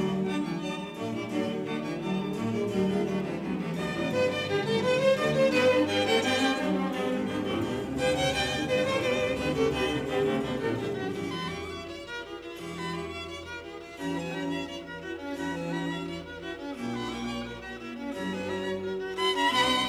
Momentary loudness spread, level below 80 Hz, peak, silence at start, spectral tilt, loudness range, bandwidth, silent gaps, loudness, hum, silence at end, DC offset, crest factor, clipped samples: 13 LU; -54 dBFS; -12 dBFS; 0 s; -5 dB/octave; 10 LU; 15.5 kHz; none; -29 LUFS; none; 0 s; under 0.1%; 16 dB; under 0.1%